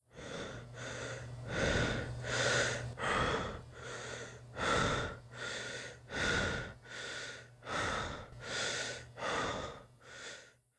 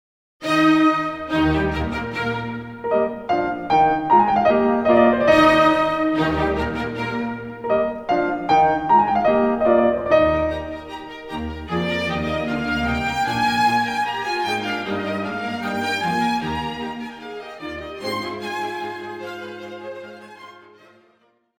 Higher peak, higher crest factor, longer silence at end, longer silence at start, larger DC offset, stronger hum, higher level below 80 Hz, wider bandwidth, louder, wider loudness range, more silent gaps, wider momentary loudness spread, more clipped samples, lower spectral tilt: second, -18 dBFS vs -2 dBFS; about the same, 20 dB vs 18 dB; second, 0.25 s vs 1.1 s; second, 0.15 s vs 0.4 s; neither; neither; second, -52 dBFS vs -42 dBFS; second, 11 kHz vs 17 kHz; second, -37 LUFS vs -20 LUFS; second, 4 LU vs 13 LU; neither; about the same, 14 LU vs 16 LU; neither; second, -3.5 dB/octave vs -6 dB/octave